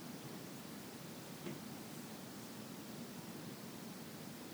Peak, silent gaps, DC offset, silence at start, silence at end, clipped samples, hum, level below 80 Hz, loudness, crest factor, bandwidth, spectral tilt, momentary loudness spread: -32 dBFS; none; under 0.1%; 0 s; 0 s; under 0.1%; none; -80 dBFS; -50 LUFS; 16 dB; over 20 kHz; -4 dB/octave; 2 LU